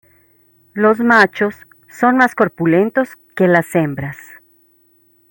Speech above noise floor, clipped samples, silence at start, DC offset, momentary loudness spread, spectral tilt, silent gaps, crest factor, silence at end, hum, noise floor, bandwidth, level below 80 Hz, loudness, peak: 41 dB; under 0.1%; 0.75 s; under 0.1%; 14 LU; -6.5 dB/octave; none; 16 dB; 1.15 s; none; -55 dBFS; 17 kHz; -58 dBFS; -15 LUFS; 0 dBFS